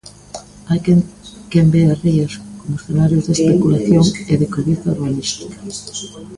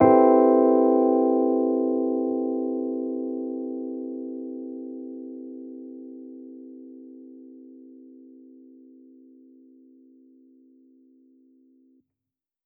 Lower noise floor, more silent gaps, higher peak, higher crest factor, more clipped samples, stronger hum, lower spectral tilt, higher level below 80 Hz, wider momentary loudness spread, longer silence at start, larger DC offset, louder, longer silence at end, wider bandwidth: second, -35 dBFS vs -89 dBFS; neither; first, 0 dBFS vs -4 dBFS; second, 16 dB vs 22 dB; neither; neither; second, -6.5 dB/octave vs -10 dB/octave; first, -42 dBFS vs -70 dBFS; second, 15 LU vs 26 LU; first, 0.35 s vs 0 s; neither; first, -16 LUFS vs -23 LUFS; second, 0 s vs 4.9 s; first, 11.5 kHz vs 2.8 kHz